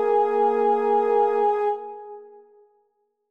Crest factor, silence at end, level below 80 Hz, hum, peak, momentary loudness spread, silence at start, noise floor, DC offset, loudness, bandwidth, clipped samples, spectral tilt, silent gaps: 14 dB; 1.05 s; -76 dBFS; none; -10 dBFS; 18 LU; 0 s; -70 dBFS; under 0.1%; -21 LUFS; 5.2 kHz; under 0.1%; -6 dB/octave; none